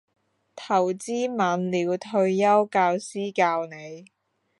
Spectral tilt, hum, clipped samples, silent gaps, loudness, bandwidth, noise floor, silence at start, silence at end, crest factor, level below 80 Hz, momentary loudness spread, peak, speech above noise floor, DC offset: -5.5 dB/octave; none; under 0.1%; none; -24 LUFS; 11.5 kHz; -46 dBFS; 0.55 s; 0.55 s; 18 dB; -78 dBFS; 13 LU; -8 dBFS; 22 dB; under 0.1%